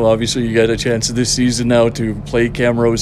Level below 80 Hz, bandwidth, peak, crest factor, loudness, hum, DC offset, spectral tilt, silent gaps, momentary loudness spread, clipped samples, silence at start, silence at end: -34 dBFS; 13.5 kHz; 0 dBFS; 14 dB; -15 LUFS; none; under 0.1%; -4.5 dB/octave; none; 4 LU; under 0.1%; 0 s; 0 s